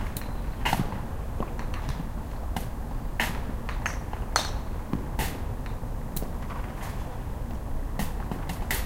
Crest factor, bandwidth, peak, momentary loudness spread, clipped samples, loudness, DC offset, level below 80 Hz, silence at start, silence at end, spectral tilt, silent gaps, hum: 28 dB; 17 kHz; -4 dBFS; 8 LU; under 0.1%; -33 LUFS; under 0.1%; -34 dBFS; 0 s; 0 s; -4.5 dB/octave; none; none